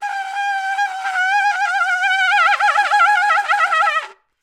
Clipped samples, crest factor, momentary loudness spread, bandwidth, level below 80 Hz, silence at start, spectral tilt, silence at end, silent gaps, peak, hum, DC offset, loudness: under 0.1%; 12 dB; 8 LU; 15 kHz; -76 dBFS; 0 s; 4 dB/octave; 0.3 s; none; -4 dBFS; none; under 0.1%; -16 LUFS